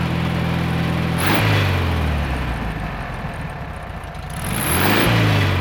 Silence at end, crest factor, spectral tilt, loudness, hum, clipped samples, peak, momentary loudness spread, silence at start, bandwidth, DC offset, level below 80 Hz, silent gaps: 0 s; 18 dB; -5 dB/octave; -20 LUFS; none; under 0.1%; -2 dBFS; 14 LU; 0 s; over 20 kHz; under 0.1%; -30 dBFS; none